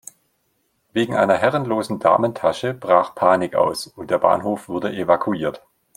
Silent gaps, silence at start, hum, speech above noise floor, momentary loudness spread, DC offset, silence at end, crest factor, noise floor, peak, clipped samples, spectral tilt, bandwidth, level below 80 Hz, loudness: none; 0.95 s; none; 49 dB; 8 LU; under 0.1%; 0.4 s; 18 dB; -68 dBFS; -2 dBFS; under 0.1%; -5.5 dB/octave; 16 kHz; -60 dBFS; -20 LUFS